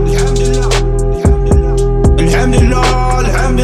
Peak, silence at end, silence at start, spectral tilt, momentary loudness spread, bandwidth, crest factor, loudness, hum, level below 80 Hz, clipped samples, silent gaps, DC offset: 0 dBFS; 0 s; 0 s; -6 dB/octave; 3 LU; 12.5 kHz; 10 dB; -12 LUFS; none; -12 dBFS; under 0.1%; none; under 0.1%